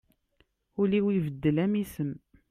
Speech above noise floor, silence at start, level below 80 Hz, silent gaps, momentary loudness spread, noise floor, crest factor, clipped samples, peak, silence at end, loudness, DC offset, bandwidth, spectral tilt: 43 dB; 0.8 s; -60 dBFS; none; 12 LU; -70 dBFS; 16 dB; under 0.1%; -14 dBFS; 0.35 s; -28 LUFS; under 0.1%; 15.5 kHz; -8 dB/octave